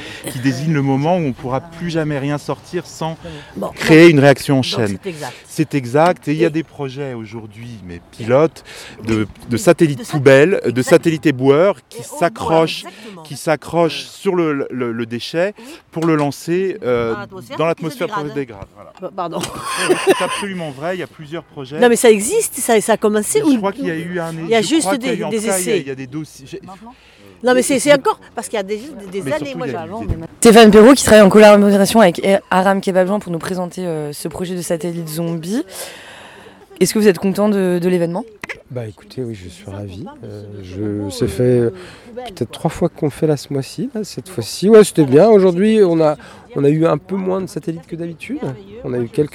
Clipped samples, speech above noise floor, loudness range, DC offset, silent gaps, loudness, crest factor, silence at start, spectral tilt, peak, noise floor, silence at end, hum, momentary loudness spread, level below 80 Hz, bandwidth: 0.2%; 25 dB; 11 LU; under 0.1%; none; -15 LUFS; 16 dB; 0 s; -5 dB/octave; 0 dBFS; -40 dBFS; 0.05 s; none; 19 LU; -46 dBFS; 18.5 kHz